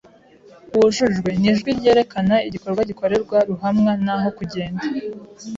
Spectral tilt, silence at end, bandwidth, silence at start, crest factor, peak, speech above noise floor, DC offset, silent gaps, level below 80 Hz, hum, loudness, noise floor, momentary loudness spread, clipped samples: -6 dB/octave; 0 s; 7.8 kHz; 0.7 s; 14 dB; -4 dBFS; 29 dB; under 0.1%; none; -50 dBFS; none; -19 LUFS; -48 dBFS; 10 LU; under 0.1%